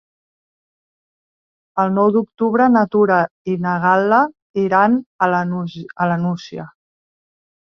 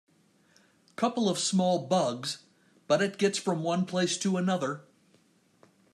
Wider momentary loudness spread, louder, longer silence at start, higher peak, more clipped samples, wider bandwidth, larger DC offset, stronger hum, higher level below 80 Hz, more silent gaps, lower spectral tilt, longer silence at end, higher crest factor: first, 12 LU vs 9 LU; first, -17 LUFS vs -28 LUFS; first, 1.75 s vs 1 s; first, -2 dBFS vs -12 dBFS; neither; second, 6.6 kHz vs 12.5 kHz; neither; neither; first, -62 dBFS vs -78 dBFS; first, 3.31-3.45 s, 4.42-4.54 s, 5.06-5.19 s vs none; first, -8.5 dB/octave vs -4.5 dB/octave; second, 0.95 s vs 1.15 s; about the same, 16 dB vs 18 dB